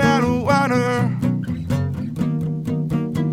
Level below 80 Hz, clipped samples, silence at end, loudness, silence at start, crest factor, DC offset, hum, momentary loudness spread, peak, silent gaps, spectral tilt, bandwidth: -44 dBFS; under 0.1%; 0 s; -21 LUFS; 0 s; 16 dB; 0.1%; none; 7 LU; -4 dBFS; none; -7 dB/octave; 15.5 kHz